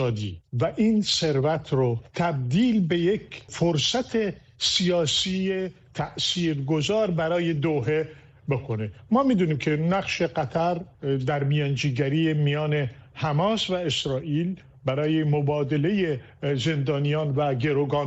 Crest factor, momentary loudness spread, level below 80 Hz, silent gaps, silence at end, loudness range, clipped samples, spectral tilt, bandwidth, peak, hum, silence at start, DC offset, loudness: 14 dB; 8 LU; -54 dBFS; none; 0 s; 2 LU; under 0.1%; -5.5 dB/octave; 8.4 kHz; -10 dBFS; none; 0 s; under 0.1%; -25 LUFS